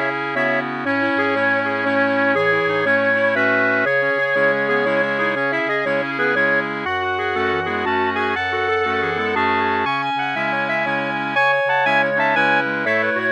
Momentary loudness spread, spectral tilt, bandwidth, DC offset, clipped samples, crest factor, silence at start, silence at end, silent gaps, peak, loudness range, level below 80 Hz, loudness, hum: 4 LU; -5.5 dB/octave; 9 kHz; under 0.1%; under 0.1%; 14 dB; 0 s; 0 s; none; -6 dBFS; 2 LU; -64 dBFS; -18 LUFS; none